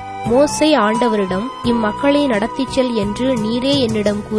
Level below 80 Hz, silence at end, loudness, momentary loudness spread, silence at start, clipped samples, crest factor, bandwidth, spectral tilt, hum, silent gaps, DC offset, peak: -40 dBFS; 0 s; -16 LUFS; 5 LU; 0 s; under 0.1%; 14 dB; 11 kHz; -5 dB/octave; none; none; under 0.1%; -2 dBFS